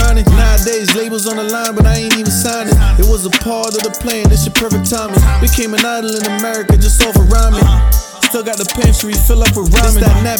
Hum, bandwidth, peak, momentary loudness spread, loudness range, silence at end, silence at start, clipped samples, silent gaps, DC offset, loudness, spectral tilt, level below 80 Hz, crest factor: none; 19 kHz; 0 dBFS; 6 LU; 2 LU; 0 s; 0 s; under 0.1%; none; under 0.1%; -12 LUFS; -4.5 dB/octave; -12 dBFS; 10 dB